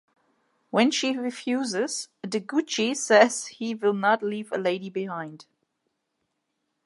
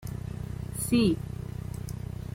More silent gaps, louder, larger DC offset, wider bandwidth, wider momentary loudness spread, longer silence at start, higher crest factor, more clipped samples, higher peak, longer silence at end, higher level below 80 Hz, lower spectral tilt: neither; first, -25 LUFS vs -31 LUFS; neither; second, 11.5 kHz vs 16.5 kHz; about the same, 13 LU vs 13 LU; first, 0.75 s vs 0 s; about the same, 22 dB vs 18 dB; neither; first, -4 dBFS vs -12 dBFS; first, 1.45 s vs 0 s; second, -82 dBFS vs -44 dBFS; second, -3.5 dB/octave vs -6 dB/octave